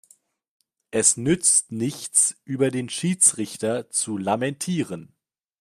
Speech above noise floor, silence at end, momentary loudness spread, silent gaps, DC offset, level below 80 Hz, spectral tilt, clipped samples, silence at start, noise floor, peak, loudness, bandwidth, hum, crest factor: 36 dB; 0.55 s; 11 LU; none; under 0.1%; -64 dBFS; -3.5 dB/octave; under 0.1%; 0.95 s; -59 dBFS; -4 dBFS; -21 LUFS; 15.5 kHz; none; 22 dB